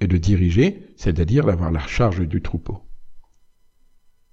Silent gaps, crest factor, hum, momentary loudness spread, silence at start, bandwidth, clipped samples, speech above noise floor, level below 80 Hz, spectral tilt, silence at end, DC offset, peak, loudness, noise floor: none; 16 dB; none; 12 LU; 0 s; 7.4 kHz; under 0.1%; 35 dB; -32 dBFS; -8 dB/octave; 1.1 s; under 0.1%; -6 dBFS; -20 LUFS; -54 dBFS